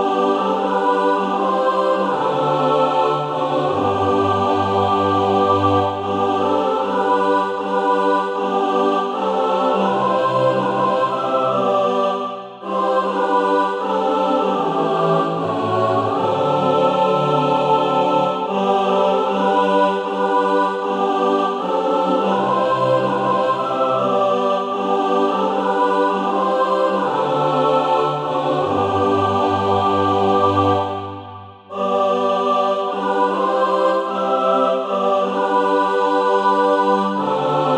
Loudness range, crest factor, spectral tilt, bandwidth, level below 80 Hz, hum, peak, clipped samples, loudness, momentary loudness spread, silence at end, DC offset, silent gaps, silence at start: 1 LU; 14 dB; -6.5 dB/octave; 10 kHz; -62 dBFS; none; -4 dBFS; under 0.1%; -18 LUFS; 4 LU; 0 s; under 0.1%; none; 0 s